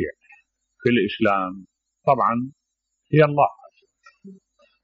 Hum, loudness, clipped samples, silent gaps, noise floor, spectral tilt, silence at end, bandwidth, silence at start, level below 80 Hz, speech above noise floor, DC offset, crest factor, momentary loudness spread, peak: none; -21 LUFS; under 0.1%; none; -77 dBFS; -5 dB/octave; 0.5 s; 6.4 kHz; 0 s; -60 dBFS; 58 dB; under 0.1%; 20 dB; 13 LU; -4 dBFS